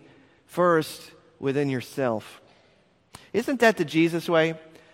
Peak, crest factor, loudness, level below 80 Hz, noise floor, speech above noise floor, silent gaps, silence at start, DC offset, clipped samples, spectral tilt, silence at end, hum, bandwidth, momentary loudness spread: -6 dBFS; 20 dB; -25 LUFS; -68 dBFS; -62 dBFS; 38 dB; none; 0.5 s; under 0.1%; under 0.1%; -5.5 dB/octave; 0.35 s; none; 16 kHz; 13 LU